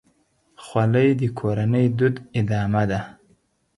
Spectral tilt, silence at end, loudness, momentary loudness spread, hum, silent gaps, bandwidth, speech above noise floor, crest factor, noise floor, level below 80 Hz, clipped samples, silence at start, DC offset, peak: -8.5 dB/octave; 0.65 s; -22 LUFS; 8 LU; none; none; 11.5 kHz; 43 dB; 16 dB; -63 dBFS; -50 dBFS; under 0.1%; 0.6 s; under 0.1%; -6 dBFS